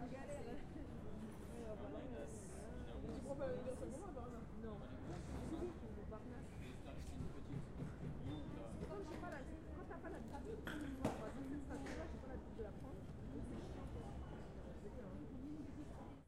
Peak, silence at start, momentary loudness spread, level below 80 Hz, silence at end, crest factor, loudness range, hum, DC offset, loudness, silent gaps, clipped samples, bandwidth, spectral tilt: -26 dBFS; 0 s; 6 LU; -56 dBFS; 0 s; 22 dB; 3 LU; none; under 0.1%; -51 LUFS; none; under 0.1%; 15.5 kHz; -7 dB/octave